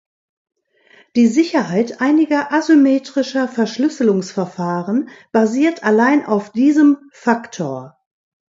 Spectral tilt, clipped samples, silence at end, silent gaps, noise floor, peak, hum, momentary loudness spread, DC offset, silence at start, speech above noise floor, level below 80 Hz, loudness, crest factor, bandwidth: -6 dB/octave; under 0.1%; 0.6 s; none; -51 dBFS; -2 dBFS; none; 10 LU; under 0.1%; 1.15 s; 36 dB; -68 dBFS; -16 LUFS; 16 dB; 7.8 kHz